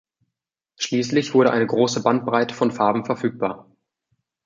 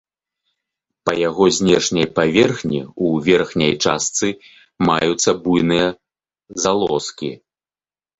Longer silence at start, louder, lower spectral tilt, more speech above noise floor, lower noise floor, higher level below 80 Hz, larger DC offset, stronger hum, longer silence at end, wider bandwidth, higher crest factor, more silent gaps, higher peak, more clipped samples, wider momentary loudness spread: second, 0.8 s vs 1.05 s; second, -21 LUFS vs -17 LUFS; about the same, -5 dB/octave vs -4 dB/octave; second, 63 dB vs over 73 dB; second, -83 dBFS vs under -90 dBFS; second, -66 dBFS vs -50 dBFS; neither; neither; about the same, 0.85 s vs 0.85 s; about the same, 7.6 kHz vs 8.2 kHz; about the same, 20 dB vs 18 dB; neither; about the same, -2 dBFS vs -2 dBFS; neither; about the same, 10 LU vs 9 LU